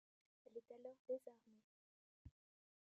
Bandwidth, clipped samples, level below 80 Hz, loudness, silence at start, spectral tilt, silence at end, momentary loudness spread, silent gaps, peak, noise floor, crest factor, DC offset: 7.2 kHz; under 0.1%; -80 dBFS; -55 LUFS; 0.45 s; -8.5 dB/octave; 0.55 s; 18 LU; 0.99-1.05 s, 1.64-2.25 s; -38 dBFS; under -90 dBFS; 20 dB; under 0.1%